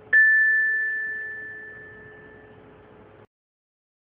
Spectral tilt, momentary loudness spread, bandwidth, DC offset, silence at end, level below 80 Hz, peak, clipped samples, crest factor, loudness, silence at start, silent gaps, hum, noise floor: -6.5 dB/octave; 25 LU; 3.7 kHz; under 0.1%; 1.75 s; -68 dBFS; -10 dBFS; under 0.1%; 16 dB; -20 LUFS; 0.1 s; none; none; -49 dBFS